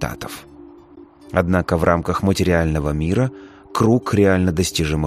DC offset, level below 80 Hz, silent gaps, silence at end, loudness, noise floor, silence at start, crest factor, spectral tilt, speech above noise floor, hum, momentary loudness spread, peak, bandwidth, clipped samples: under 0.1%; -34 dBFS; none; 0 s; -19 LUFS; -44 dBFS; 0 s; 18 dB; -6 dB/octave; 26 dB; none; 11 LU; -2 dBFS; 15.5 kHz; under 0.1%